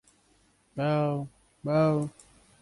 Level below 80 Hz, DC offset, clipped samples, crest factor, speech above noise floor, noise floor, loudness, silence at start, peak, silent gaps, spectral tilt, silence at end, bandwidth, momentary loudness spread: -64 dBFS; under 0.1%; under 0.1%; 18 dB; 39 dB; -66 dBFS; -29 LUFS; 0.75 s; -12 dBFS; none; -8 dB/octave; 0.5 s; 11.5 kHz; 16 LU